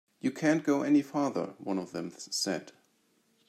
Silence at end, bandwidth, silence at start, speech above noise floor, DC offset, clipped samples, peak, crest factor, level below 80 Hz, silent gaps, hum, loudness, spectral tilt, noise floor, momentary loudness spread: 0.8 s; 14 kHz; 0.25 s; 41 dB; under 0.1%; under 0.1%; -14 dBFS; 18 dB; -80 dBFS; none; none; -31 LUFS; -4.5 dB/octave; -71 dBFS; 11 LU